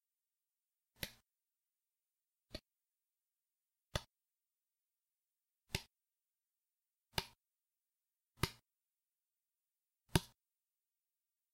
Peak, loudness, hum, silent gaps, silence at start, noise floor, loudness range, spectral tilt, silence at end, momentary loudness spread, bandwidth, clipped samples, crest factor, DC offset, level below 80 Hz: -14 dBFS; -44 LUFS; none; none; 1 s; under -90 dBFS; 10 LU; -4 dB/octave; 1.3 s; 17 LU; 16 kHz; under 0.1%; 38 dB; under 0.1%; -62 dBFS